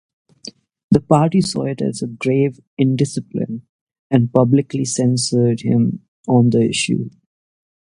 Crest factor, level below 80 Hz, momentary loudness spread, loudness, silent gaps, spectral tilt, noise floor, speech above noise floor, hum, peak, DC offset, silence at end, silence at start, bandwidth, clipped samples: 18 dB; -52 dBFS; 14 LU; -17 LUFS; 0.84-0.89 s, 2.67-2.77 s, 3.69-3.87 s, 3.99-4.10 s, 6.08-6.24 s; -6 dB/octave; -40 dBFS; 24 dB; none; 0 dBFS; under 0.1%; 0.8 s; 0.45 s; 11.5 kHz; under 0.1%